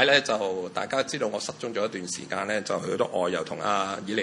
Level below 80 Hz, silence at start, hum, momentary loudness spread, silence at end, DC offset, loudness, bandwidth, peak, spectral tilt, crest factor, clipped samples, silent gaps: -72 dBFS; 0 s; none; 5 LU; 0 s; under 0.1%; -28 LUFS; 11.5 kHz; -4 dBFS; -3 dB/octave; 24 dB; under 0.1%; none